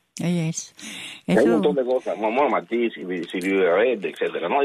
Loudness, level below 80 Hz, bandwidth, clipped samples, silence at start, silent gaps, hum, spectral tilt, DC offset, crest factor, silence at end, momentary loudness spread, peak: -22 LUFS; -66 dBFS; 14 kHz; under 0.1%; 0.15 s; none; none; -5.5 dB/octave; under 0.1%; 16 dB; 0 s; 13 LU; -6 dBFS